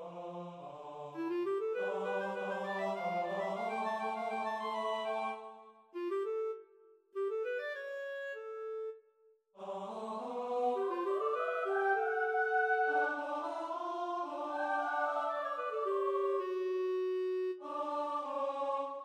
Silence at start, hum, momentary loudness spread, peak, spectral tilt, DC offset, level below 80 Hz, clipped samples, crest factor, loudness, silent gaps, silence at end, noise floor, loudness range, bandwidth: 0 s; none; 13 LU; -22 dBFS; -5.5 dB/octave; under 0.1%; under -90 dBFS; under 0.1%; 16 dB; -36 LUFS; none; 0 s; -69 dBFS; 7 LU; 9.8 kHz